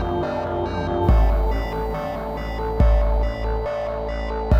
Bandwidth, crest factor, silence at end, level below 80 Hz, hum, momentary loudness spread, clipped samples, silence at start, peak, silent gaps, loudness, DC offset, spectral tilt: 6.4 kHz; 16 dB; 0 s; -22 dBFS; none; 8 LU; under 0.1%; 0 s; -4 dBFS; none; -23 LUFS; under 0.1%; -8.5 dB/octave